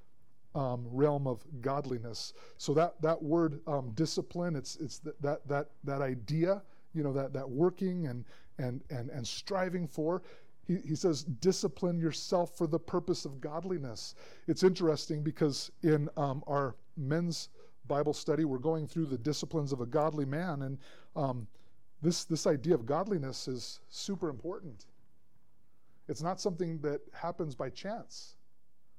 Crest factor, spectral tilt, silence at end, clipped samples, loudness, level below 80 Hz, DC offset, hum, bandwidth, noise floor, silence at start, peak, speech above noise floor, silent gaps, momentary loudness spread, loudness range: 18 dB; -6 dB/octave; 0.65 s; under 0.1%; -35 LUFS; -70 dBFS; 0.4%; none; 15 kHz; -77 dBFS; 0.55 s; -16 dBFS; 43 dB; none; 11 LU; 6 LU